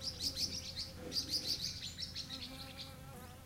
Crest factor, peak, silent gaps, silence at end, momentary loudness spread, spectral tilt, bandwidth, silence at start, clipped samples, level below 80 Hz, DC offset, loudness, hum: 18 dB; -24 dBFS; none; 0 s; 13 LU; -2 dB/octave; 16 kHz; 0 s; under 0.1%; -60 dBFS; under 0.1%; -40 LUFS; none